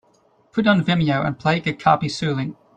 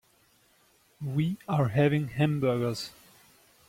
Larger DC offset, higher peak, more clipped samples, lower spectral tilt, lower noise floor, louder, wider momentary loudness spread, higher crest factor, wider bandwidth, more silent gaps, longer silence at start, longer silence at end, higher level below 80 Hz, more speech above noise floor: neither; first, -2 dBFS vs -12 dBFS; neither; about the same, -6.5 dB/octave vs -7.5 dB/octave; second, -59 dBFS vs -65 dBFS; first, -20 LUFS vs -28 LUFS; second, 6 LU vs 12 LU; about the same, 20 dB vs 18 dB; second, 9 kHz vs 16 kHz; neither; second, 0.55 s vs 1 s; second, 0.25 s vs 0.8 s; first, -54 dBFS vs -62 dBFS; about the same, 39 dB vs 38 dB